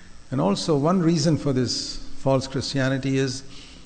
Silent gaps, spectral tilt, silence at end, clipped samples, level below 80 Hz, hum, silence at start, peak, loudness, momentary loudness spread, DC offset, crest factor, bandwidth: none; -5.5 dB/octave; 0 s; under 0.1%; -44 dBFS; none; 0 s; -8 dBFS; -23 LUFS; 10 LU; under 0.1%; 16 dB; 9.6 kHz